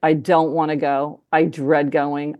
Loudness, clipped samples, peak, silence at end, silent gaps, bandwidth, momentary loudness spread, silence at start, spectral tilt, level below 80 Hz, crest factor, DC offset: -19 LUFS; under 0.1%; -2 dBFS; 0.05 s; none; 12 kHz; 4 LU; 0 s; -7.5 dB/octave; -74 dBFS; 16 dB; under 0.1%